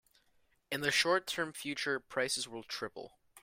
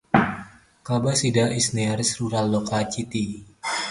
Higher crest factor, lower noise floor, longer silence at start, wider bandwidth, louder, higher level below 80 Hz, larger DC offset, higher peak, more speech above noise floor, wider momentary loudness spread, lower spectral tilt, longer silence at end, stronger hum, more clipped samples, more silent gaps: about the same, 22 dB vs 22 dB; first, -72 dBFS vs -43 dBFS; first, 0.7 s vs 0.15 s; first, 16 kHz vs 11.5 kHz; second, -34 LUFS vs -23 LUFS; second, -74 dBFS vs -52 dBFS; neither; second, -14 dBFS vs -2 dBFS; first, 37 dB vs 20 dB; first, 13 LU vs 10 LU; second, -2 dB/octave vs -4.5 dB/octave; about the same, 0.05 s vs 0 s; neither; neither; neither